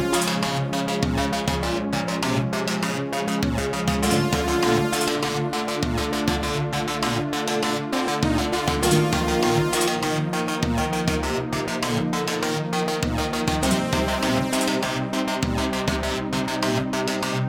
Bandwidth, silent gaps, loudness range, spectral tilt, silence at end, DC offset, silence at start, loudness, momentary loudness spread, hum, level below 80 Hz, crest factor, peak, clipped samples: 19 kHz; none; 2 LU; -4.5 dB/octave; 0 s; under 0.1%; 0 s; -23 LUFS; 4 LU; none; -38 dBFS; 16 dB; -8 dBFS; under 0.1%